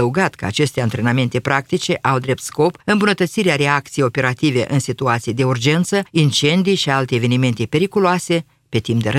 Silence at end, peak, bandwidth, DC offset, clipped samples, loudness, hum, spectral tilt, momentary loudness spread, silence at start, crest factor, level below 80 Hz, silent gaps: 0 s; 0 dBFS; 15 kHz; under 0.1%; under 0.1%; -17 LUFS; none; -5.5 dB/octave; 4 LU; 0 s; 16 dB; -52 dBFS; none